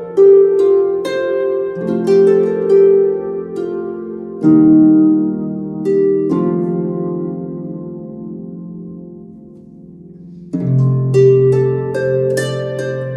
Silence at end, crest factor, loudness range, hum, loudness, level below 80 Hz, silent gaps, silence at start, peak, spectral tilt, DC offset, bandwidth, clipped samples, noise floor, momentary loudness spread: 0 s; 14 dB; 12 LU; none; -14 LUFS; -54 dBFS; none; 0 s; 0 dBFS; -8.5 dB/octave; under 0.1%; 11.5 kHz; under 0.1%; -37 dBFS; 20 LU